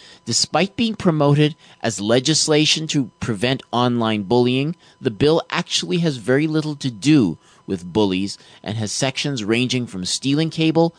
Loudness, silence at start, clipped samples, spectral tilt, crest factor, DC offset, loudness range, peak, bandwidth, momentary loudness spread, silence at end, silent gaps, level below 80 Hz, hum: -19 LUFS; 0.25 s; under 0.1%; -4.5 dB/octave; 16 dB; under 0.1%; 3 LU; -4 dBFS; 10 kHz; 10 LU; 0.1 s; none; -56 dBFS; none